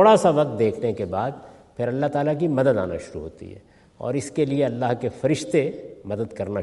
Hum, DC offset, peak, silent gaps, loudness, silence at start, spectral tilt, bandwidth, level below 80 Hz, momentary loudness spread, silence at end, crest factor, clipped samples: none; under 0.1%; -2 dBFS; none; -23 LUFS; 0 s; -6.5 dB/octave; 11.5 kHz; -58 dBFS; 16 LU; 0 s; 20 dB; under 0.1%